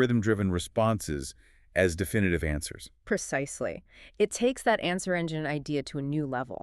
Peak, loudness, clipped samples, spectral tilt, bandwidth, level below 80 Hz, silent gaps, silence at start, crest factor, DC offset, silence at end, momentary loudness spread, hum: -10 dBFS; -29 LUFS; under 0.1%; -5.5 dB/octave; 13.5 kHz; -46 dBFS; none; 0 s; 18 dB; under 0.1%; 0.05 s; 9 LU; none